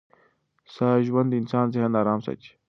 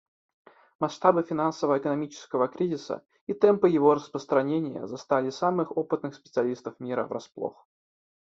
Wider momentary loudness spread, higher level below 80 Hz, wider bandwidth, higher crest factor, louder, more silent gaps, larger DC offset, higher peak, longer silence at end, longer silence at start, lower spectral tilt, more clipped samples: second, 6 LU vs 14 LU; first, -66 dBFS vs -72 dBFS; second, 6.2 kHz vs 7.8 kHz; about the same, 18 dB vs 22 dB; first, -24 LUFS vs -27 LUFS; second, none vs 3.21-3.27 s; neither; about the same, -8 dBFS vs -6 dBFS; second, 0.2 s vs 0.75 s; about the same, 0.7 s vs 0.8 s; first, -9.5 dB/octave vs -7 dB/octave; neither